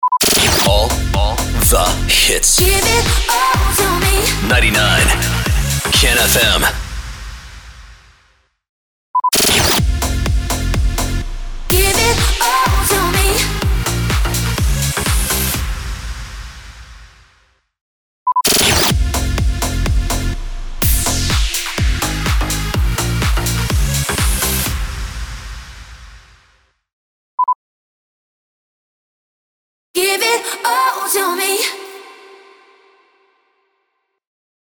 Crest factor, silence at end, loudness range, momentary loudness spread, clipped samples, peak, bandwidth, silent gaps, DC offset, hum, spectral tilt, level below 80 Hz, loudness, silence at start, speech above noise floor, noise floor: 14 dB; 2.55 s; 11 LU; 17 LU; under 0.1%; -2 dBFS; over 20 kHz; 8.69-9.14 s, 17.81-18.26 s, 26.93-27.38 s, 27.55-29.94 s; under 0.1%; none; -3 dB/octave; -22 dBFS; -14 LUFS; 0 s; 57 dB; -69 dBFS